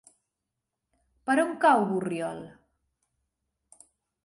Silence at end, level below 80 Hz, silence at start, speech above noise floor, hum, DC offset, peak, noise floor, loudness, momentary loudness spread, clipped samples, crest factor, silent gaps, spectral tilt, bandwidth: 1.75 s; -74 dBFS; 1.25 s; 60 dB; none; under 0.1%; -10 dBFS; -85 dBFS; -26 LUFS; 16 LU; under 0.1%; 20 dB; none; -5.5 dB/octave; 11.5 kHz